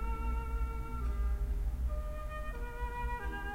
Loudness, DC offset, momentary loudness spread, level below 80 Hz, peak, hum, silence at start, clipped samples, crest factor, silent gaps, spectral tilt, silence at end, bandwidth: -39 LUFS; under 0.1%; 5 LU; -36 dBFS; -26 dBFS; none; 0 s; under 0.1%; 10 dB; none; -7 dB/octave; 0 s; 15.5 kHz